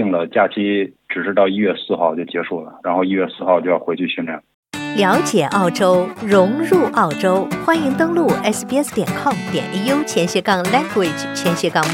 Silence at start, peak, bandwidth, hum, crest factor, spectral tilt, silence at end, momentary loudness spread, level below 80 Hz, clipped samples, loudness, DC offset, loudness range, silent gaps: 0 s; -2 dBFS; 17.5 kHz; none; 16 dB; -5 dB/octave; 0 s; 8 LU; -58 dBFS; under 0.1%; -17 LUFS; under 0.1%; 3 LU; 4.54-4.63 s